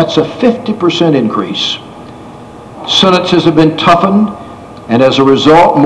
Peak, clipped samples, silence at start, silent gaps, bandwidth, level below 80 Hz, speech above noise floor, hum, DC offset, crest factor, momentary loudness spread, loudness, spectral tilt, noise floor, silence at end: 0 dBFS; 2%; 0 s; none; 11 kHz; -42 dBFS; 21 dB; none; under 0.1%; 10 dB; 21 LU; -9 LUFS; -5.5 dB/octave; -30 dBFS; 0 s